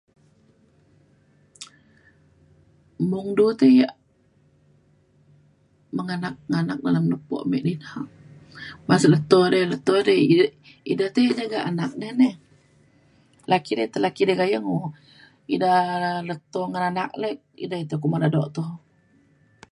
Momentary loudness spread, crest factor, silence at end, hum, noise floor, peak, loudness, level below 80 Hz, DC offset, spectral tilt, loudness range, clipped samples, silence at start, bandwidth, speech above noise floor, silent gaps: 17 LU; 20 dB; 0.95 s; none; -61 dBFS; -2 dBFS; -22 LUFS; -66 dBFS; under 0.1%; -6.5 dB/octave; 7 LU; under 0.1%; 1.6 s; 11.5 kHz; 40 dB; none